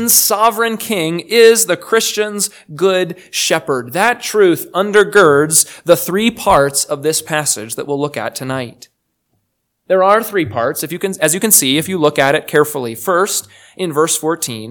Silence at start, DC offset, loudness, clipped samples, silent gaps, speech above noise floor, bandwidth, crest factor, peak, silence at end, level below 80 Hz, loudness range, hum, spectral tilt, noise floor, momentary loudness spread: 0 s; under 0.1%; -14 LUFS; 0.3%; none; 54 dB; over 20 kHz; 14 dB; 0 dBFS; 0 s; -50 dBFS; 6 LU; none; -2.5 dB/octave; -68 dBFS; 11 LU